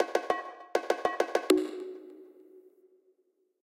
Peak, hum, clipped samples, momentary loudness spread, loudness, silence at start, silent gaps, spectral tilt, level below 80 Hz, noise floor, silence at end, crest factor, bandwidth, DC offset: -10 dBFS; none; under 0.1%; 17 LU; -31 LUFS; 0 s; none; -2.5 dB/octave; -76 dBFS; -74 dBFS; 1 s; 22 dB; 16 kHz; under 0.1%